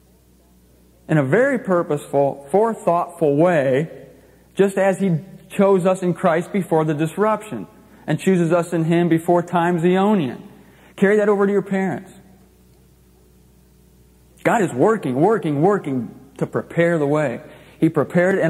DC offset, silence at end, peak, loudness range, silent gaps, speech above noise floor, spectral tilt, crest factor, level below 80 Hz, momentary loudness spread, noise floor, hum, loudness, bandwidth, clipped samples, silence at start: under 0.1%; 0 s; -2 dBFS; 4 LU; none; 35 dB; -7.5 dB/octave; 18 dB; -58 dBFS; 10 LU; -53 dBFS; none; -19 LUFS; 14.5 kHz; under 0.1%; 1.1 s